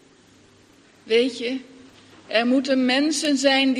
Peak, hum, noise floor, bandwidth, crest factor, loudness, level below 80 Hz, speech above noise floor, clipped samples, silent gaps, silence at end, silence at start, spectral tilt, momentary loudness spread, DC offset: -4 dBFS; none; -54 dBFS; 12.5 kHz; 18 dB; -21 LUFS; -72 dBFS; 33 dB; under 0.1%; none; 0 s; 1.05 s; -2 dB/octave; 10 LU; under 0.1%